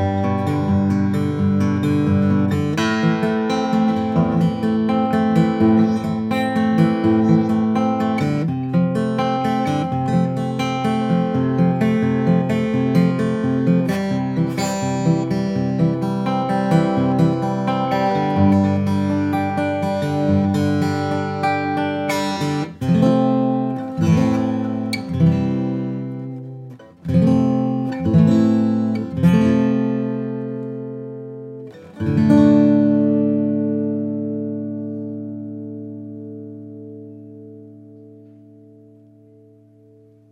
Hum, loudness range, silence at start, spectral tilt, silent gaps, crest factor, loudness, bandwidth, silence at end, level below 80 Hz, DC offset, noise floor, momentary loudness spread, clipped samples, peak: none; 4 LU; 0 s; -8 dB/octave; none; 16 dB; -18 LUFS; 13.5 kHz; 2.15 s; -58 dBFS; under 0.1%; -49 dBFS; 15 LU; under 0.1%; -2 dBFS